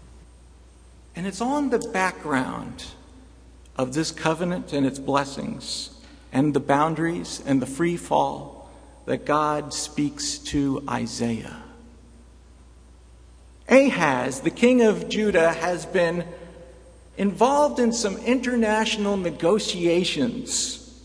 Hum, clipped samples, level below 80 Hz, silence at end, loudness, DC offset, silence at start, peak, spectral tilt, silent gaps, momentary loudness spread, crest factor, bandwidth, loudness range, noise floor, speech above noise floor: none; under 0.1%; -50 dBFS; 0.05 s; -23 LUFS; under 0.1%; 0 s; -4 dBFS; -4.5 dB/octave; none; 14 LU; 22 dB; 11 kHz; 7 LU; -49 dBFS; 26 dB